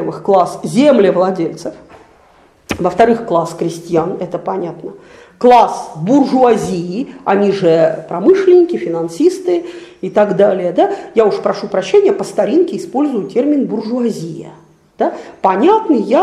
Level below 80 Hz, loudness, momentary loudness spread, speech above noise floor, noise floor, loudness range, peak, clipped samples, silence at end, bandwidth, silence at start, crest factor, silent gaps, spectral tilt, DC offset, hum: -54 dBFS; -13 LUFS; 11 LU; 35 dB; -48 dBFS; 5 LU; 0 dBFS; under 0.1%; 0 s; 13 kHz; 0 s; 14 dB; none; -6.5 dB/octave; under 0.1%; none